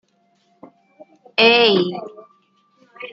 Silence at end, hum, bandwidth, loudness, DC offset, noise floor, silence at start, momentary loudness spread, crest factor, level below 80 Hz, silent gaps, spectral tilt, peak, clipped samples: 0 s; none; 7.2 kHz; -15 LUFS; under 0.1%; -62 dBFS; 1.4 s; 24 LU; 22 dB; -74 dBFS; none; -5.5 dB/octave; 0 dBFS; under 0.1%